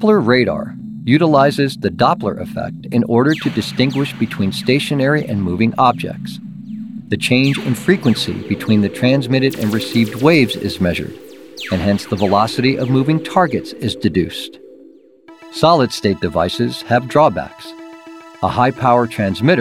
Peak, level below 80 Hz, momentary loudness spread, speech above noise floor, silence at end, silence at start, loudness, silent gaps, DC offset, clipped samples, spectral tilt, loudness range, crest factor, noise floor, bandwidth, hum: 0 dBFS; -50 dBFS; 16 LU; 29 dB; 0 s; 0 s; -16 LUFS; none; 0.2%; under 0.1%; -6 dB/octave; 2 LU; 16 dB; -44 dBFS; 16.5 kHz; none